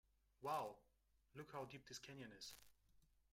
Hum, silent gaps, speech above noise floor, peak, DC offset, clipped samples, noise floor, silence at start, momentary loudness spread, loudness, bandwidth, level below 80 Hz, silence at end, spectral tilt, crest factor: none; none; 28 dB; -34 dBFS; under 0.1%; under 0.1%; -81 dBFS; 0.4 s; 16 LU; -53 LUFS; 16 kHz; -80 dBFS; 0.3 s; -4 dB/octave; 20 dB